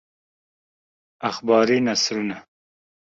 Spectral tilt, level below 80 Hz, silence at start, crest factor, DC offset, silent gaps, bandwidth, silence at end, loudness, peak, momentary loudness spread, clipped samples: -3.5 dB/octave; -66 dBFS; 1.2 s; 20 dB; under 0.1%; none; 8 kHz; 0.75 s; -21 LUFS; -4 dBFS; 12 LU; under 0.1%